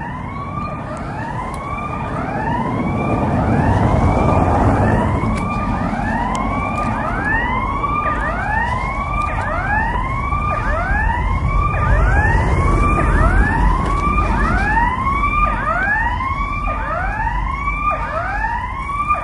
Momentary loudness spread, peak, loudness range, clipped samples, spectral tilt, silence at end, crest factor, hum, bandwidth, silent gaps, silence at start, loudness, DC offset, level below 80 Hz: 8 LU; -2 dBFS; 3 LU; under 0.1%; -7.5 dB/octave; 0 s; 14 dB; none; 11.5 kHz; none; 0 s; -18 LUFS; under 0.1%; -22 dBFS